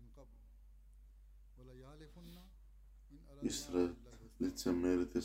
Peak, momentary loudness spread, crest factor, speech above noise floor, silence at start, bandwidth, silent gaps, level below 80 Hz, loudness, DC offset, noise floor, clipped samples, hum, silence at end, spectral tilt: -22 dBFS; 26 LU; 20 dB; 21 dB; 0 s; 16 kHz; none; -58 dBFS; -39 LUFS; under 0.1%; -60 dBFS; under 0.1%; none; 0 s; -5 dB/octave